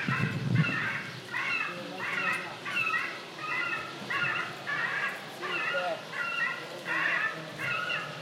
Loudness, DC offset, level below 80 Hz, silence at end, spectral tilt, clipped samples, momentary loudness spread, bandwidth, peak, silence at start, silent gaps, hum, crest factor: -31 LUFS; under 0.1%; -70 dBFS; 0 s; -4.5 dB/octave; under 0.1%; 7 LU; 16 kHz; -14 dBFS; 0 s; none; none; 18 dB